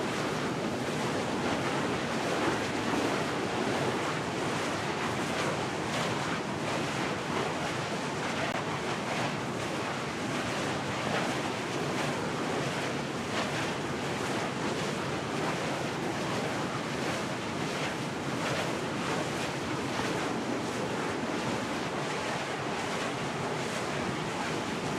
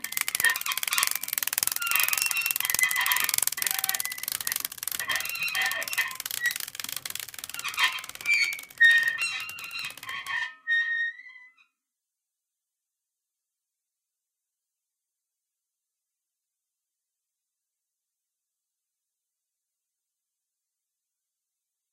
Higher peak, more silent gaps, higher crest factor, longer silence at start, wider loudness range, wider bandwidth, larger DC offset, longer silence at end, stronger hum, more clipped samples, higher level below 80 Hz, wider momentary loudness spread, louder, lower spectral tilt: second, -16 dBFS vs 0 dBFS; neither; second, 16 dB vs 30 dB; about the same, 0 s vs 0.05 s; second, 2 LU vs 8 LU; about the same, 16 kHz vs 16.5 kHz; neither; second, 0 s vs 10.45 s; neither; neither; first, -62 dBFS vs -74 dBFS; second, 3 LU vs 11 LU; second, -32 LUFS vs -26 LUFS; first, -4.5 dB/octave vs 2.5 dB/octave